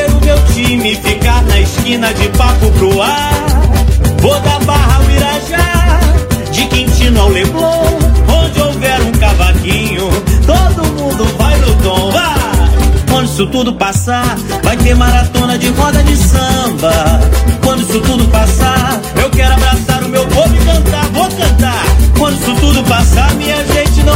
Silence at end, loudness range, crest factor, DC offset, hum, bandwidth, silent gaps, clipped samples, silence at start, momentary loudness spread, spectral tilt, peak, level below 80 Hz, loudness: 0 s; 1 LU; 8 dB; under 0.1%; none; 16.5 kHz; none; 0.8%; 0 s; 3 LU; -5 dB/octave; 0 dBFS; -12 dBFS; -10 LUFS